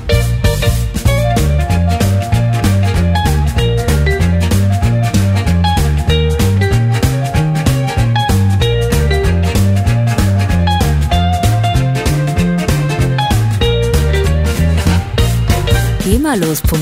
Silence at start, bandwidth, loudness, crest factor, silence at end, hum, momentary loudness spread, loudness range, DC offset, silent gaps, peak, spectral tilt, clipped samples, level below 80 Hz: 0 s; 16.5 kHz; -13 LUFS; 12 dB; 0 s; none; 2 LU; 1 LU; under 0.1%; none; 0 dBFS; -6 dB/octave; under 0.1%; -18 dBFS